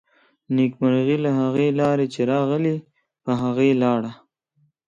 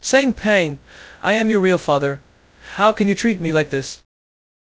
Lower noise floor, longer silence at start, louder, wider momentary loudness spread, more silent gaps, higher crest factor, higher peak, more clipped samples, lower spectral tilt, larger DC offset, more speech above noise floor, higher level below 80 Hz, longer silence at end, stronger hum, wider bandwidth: first, -66 dBFS vs -42 dBFS; first, 0.5 s vs 0.05 s; second, -21 LUFS vs -18 LUFS; second, 7 LU vs 16 LU; neither; second, 14 dB vs 20 dB; second, -8 dBFS vs 0 dBFS; neither; first, -8 dB/octave vs -5 dB/octave; neither; first, 46 dB vs 24 dB; second, -64 dBFS vs -50 dBFS; about the same, 0.75 s vs 0.7 s; neither; about the same, 7.8 kHz vs 8 kHz